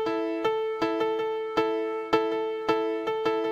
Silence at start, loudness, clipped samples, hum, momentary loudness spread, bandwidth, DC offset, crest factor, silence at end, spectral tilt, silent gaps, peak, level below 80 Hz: 0 s; -28 LUFS; under 0.1%; none; 2 LU; 15 kHz; under 0.1%; 18 dB; 0 s; -5.5 dB/octave; none; -8 dBFS; -64 dBFS